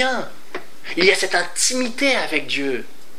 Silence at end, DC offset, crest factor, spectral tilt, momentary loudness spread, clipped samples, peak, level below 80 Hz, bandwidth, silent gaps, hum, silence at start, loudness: 0.35 s; 5%; 20 dB; -1.5 dB/octave; 17 LU; under 0.1%; 0 dBFS; -72 dBFS; 16 kHz; none; none; 0 s; -19 LUFS